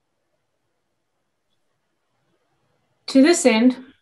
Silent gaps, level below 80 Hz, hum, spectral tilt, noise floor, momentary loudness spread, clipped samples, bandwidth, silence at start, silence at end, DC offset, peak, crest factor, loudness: none; -74 dBFS; none; -3 dB/octave; -75 dBFS; 7 LU; under 0.1%; 12 kHz; 3.1 s; 0.2 s; under 0.1%; -2 dBFS; 20 dB; -16 LUFS